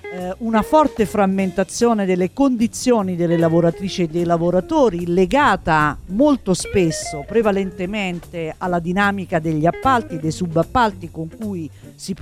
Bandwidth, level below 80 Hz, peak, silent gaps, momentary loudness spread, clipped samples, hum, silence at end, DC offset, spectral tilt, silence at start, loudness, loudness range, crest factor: 15.5 kHz; -42 dBFS; -4 dBFS; none; 12 LU; under 0.1%; none; 0 s; under 0.1%; -6 dB/octave; 0.05 s; -18 LUFS; 3 LU; 16 dB